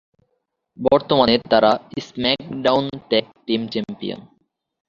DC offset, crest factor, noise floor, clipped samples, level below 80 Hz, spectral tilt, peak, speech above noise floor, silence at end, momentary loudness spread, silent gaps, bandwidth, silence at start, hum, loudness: under 0.1%; 20 dB; -73 dBFS; under 0.1%; -54 dBFS; -6 dB/octave; -2 dBFS; 54 dB; 0.7 s; 14 LU; none; 7.4 kHz; 0.8 s; none; -19 LUFS